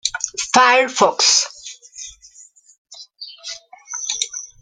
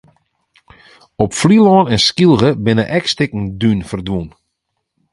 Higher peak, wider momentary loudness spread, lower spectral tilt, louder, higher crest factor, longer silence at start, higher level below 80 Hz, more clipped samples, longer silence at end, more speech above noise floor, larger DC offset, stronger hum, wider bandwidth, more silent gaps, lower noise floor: about the same, 0 dBFS vs 0 dBFS; first, 22 LU vs 12 LU; second, 0 dB/octave vs -5.5 dB/octave; second, -16 LUFS vs -13 LUFS; first, 20 dB vs 14 dB; second, 0.05 s vs 1.2 s; second, -62 dBFS vs -42 dBFS; neither; second, 0.15 s vs 0.85 s; second, 33 dB vs 60 dB; neither; neither; about the same, 11 kHz vs 11.5 kHz; first, 2.78-2.85 s vs none; second, -48 dBFS vs -73 dBFS